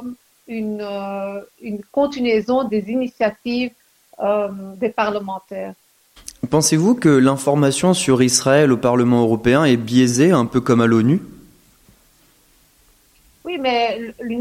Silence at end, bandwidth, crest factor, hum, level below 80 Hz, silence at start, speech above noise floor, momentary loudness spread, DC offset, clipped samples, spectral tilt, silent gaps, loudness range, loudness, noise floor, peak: 0 s; 15.5 kHz; 16 dB; none; -52 dBFS; 0 s; 38 dB; 16 LU; under 0.1%; under 0.1%; -5 dB/octave; none; 8 LU; -17 LUFS; -55 dBFS; -2 dBFS